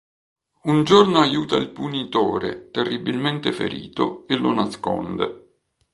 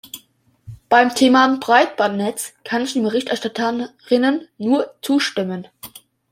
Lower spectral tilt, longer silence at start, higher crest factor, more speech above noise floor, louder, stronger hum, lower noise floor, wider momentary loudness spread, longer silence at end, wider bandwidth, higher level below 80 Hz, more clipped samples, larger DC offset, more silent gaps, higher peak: first, -6 dB/octave vs -4 dB/octave; first, 0.65 s vs 0.05 s; about the same, 22 dB vs 18 dB; first, 41 dB vs 37 dB; second, -21 LUFS vs -18 LUFS; neither; first, -61 dBFS vs -55 dBFS; second, 12 LU vs 16 LU; first, 0.55 s vs 0.35 s; second, 11.5 kHz vs 16 kHz; first, -56 dBFS vs -62 dBFS; neither; neither; neither; about the same, 0 dBFS vs -2 dBFS